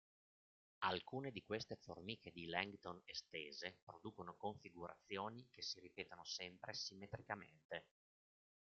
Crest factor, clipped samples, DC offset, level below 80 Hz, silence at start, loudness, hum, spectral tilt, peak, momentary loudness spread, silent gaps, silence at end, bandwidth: 28 dB; under 0.1%; under 0.1%; -82 dBFS; 0.8 s; -50 LUFS; none; -2 dB/octave; -24 dBFS; 10 LU; 3.82-3.87 s, 7.65-7.69 s; 0.95 s; 7.6 kHz